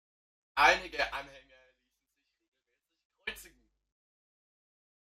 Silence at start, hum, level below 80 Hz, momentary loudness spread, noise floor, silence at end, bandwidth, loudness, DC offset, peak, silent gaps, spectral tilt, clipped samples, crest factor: 0.55 s; none; -62 dBFS; 21 LU; -84 dBFS; 1.65 s; 15 kHz; -28 LUFS; under 0.1%; -10 dBFS; 2.48-2.52 s, 3.05-3.10 s; -1.5 dB/octave; under 0.1%; 26 dB